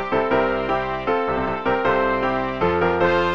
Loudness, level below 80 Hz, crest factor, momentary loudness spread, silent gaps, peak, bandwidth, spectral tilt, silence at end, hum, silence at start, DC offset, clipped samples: -21 LUFS; -42 dBFS; 14 dB; 4 LU; none; -6 dBFS; 7 kHz; -7 dB/octave; 0 s; none; 0 s; 0.9%; under 0.1%